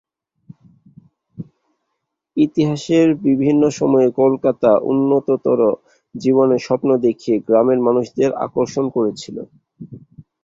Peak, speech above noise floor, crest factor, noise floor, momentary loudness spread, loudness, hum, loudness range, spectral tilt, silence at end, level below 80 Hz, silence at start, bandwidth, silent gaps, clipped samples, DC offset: -2 dBFS; 60 dB; 16 dB; -76 dBFS; 17 LU; -16 LUFS; none; 4 LU; -7 dB/octave; 0.2 s; -58 dBFS; 1.4 s; 7.8 kHz; none; under 0.1%; under 0.1%